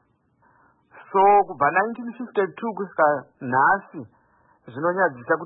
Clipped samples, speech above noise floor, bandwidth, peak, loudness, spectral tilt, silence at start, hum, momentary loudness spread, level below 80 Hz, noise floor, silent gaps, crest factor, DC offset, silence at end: under 0.1%; 41 dB; 3.9 kHz; -6 dBFS; -22 LUFS; -10.5 dB/octave; 0.95 s; none; 13 LU; -66 dBFS; -63 dBFS; none; 18 dB; under 0.1%; 0 s